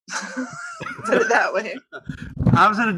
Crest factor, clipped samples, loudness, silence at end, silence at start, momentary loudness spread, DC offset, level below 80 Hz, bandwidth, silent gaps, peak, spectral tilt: 18 dB; under 0.1%; -20 LUFS; 0 s; 0.1 s; 19 LU; under 0.1%; -42 dBFS; 12 kHz; none; -2 dBFS; -5.5 dB/octave